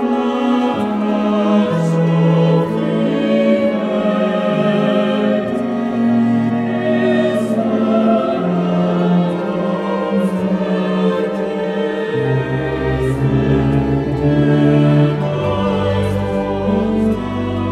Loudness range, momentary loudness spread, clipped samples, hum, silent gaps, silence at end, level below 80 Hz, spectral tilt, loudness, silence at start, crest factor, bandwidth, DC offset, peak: 3 LU; 5 LU; under 0.1%; none; none; 0 s; -38 dBFS; -8.5 dB/octave; -16 LUFS; 0 s; 12 dB; 11 kHz; under 0.1%; -2 dBFS